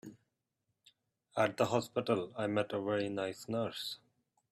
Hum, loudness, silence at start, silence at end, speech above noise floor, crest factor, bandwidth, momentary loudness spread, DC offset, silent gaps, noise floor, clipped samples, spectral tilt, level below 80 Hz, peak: none; -36 LUFS; 0.05 s; 0.55 s; 50 dB; 20 dB; 15.5 kHz; 10 LU; under 0.1%; none; -85 dBFS; under 0.1%; -5.5 dB/octave; -76 dBFS; -16 dBFS